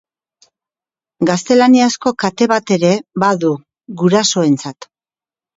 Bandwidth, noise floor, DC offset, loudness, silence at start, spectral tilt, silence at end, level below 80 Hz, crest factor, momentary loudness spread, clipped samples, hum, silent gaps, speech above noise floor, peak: 8 kHz; under -90 dBFS; under 0.1%; -14 LUFS; 1.2 s; -5 dB/octave; 0.7 s; -60 dBFS; 16 dB; 9 LU; under 0.1%; none; none; over 77 dB; 0 dBFS